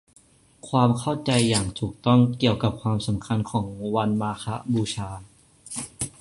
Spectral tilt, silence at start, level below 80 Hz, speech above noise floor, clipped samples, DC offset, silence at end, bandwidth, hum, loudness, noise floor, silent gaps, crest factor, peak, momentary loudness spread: -5.5 dB/octave; 0.65 s; -50 dBFS; 27 dB; under 0.1%; under 0.1%; 0.1 s; 11.5 kHz; none; -24 LUFS; -50 dBFS; none; 20 dB; -4 dBFS; 12 LU